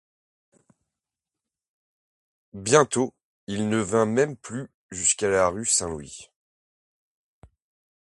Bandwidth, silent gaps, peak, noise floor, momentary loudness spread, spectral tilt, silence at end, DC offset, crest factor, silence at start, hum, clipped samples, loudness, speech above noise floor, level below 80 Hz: 11.5 kHz; 3.24-3.47 s, 4.74-4.89 s; -2 dBFS; -89 dBFS; 17 LU; -3.5 dB/octave; 1.8 s; under 0.1%; 26 dB; 2.55 s; none; under 0.1%; -23 LUFS; 65 dB; -56 dBFS